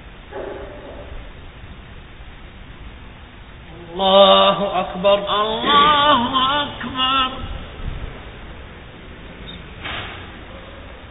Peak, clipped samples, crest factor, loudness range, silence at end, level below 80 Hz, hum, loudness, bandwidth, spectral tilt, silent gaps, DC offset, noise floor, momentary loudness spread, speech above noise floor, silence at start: 0 dBFS; under 0.1%; 20 dB; 22 LU; 0 s; -38 dBFS; none; -16 LUFS; 4 kHz; -9 dB/octave; none; under 0.1%; -39 dBFS; 27 LU; 23 dB; 0 s